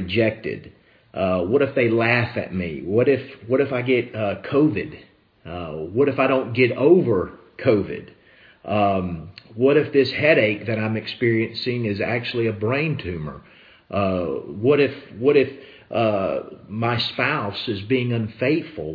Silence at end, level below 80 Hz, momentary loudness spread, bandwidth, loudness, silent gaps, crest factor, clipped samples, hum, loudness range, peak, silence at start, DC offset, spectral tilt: 0 s; -54 dBFS; 13 LU; 5.2 kHz; -21 LUFS; none; 20 dB; under 0.1%; none; 3 LU; -2 dBFS; 0 s; under 0.1%; -9 dB/octave